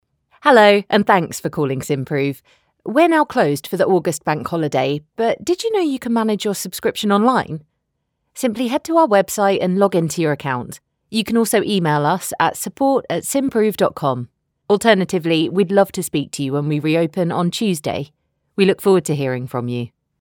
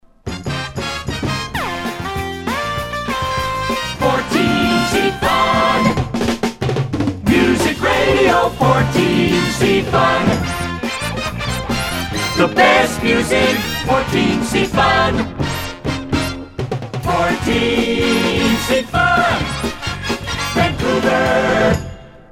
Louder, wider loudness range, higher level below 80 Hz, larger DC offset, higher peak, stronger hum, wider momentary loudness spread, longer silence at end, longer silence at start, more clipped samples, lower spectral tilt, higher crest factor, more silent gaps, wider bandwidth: about the same, -18 LUFS vs -16 LUFS; about the same, 2 LU vs 4 LU; second, -58 dBFS vs -34 dBFS; neither; about the same, 0 dBFS vs 0 dBFS; neither; about the same, 10 LU vs 9 LU; first, 0.35 s vs 0.15 s; first, 0.45 s vs 0.25 s; neither; about the same, -5 dB/octave vs -5 dB/octave; about the same, 18 dB vs 16 dB; neither; first, over 20 kHz vs 16.5 kHz